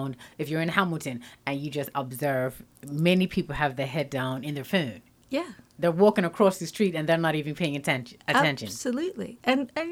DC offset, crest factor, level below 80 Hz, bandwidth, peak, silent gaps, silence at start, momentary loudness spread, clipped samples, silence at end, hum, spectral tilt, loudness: under 0.1%; 22 dB; -58 dBFS; 17 kHz; -6 dBFS; none; 0 s; 10 LU; under 0.1%; 0 s; none; -5.5 dB/octave; -27 LUFS